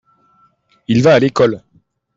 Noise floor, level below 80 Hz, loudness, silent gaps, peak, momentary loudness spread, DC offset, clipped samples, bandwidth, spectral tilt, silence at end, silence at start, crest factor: -56 dBFS; -52 dBFS; -13 LUFS; none; -2 dBFS; 19 LU; under 0.1%; under 0.1%; 7.8 kHz; -6.5 dB/octave; 0.6 s; 0.9 s; 14 dB